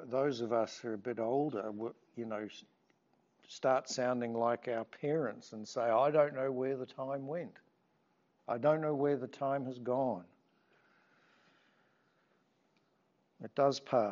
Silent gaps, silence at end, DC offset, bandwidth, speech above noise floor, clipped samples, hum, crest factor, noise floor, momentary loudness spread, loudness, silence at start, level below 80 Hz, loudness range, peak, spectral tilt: none; 0 s; under 0.1%; 7.4 kHz; 41 dB; under 0.1%; none; 22 dB; -76 dBFS; 13 LU; -35 LUFS; 0 s; -90 dBFS; 7 LU; -16 dBFS; -5 dB/octave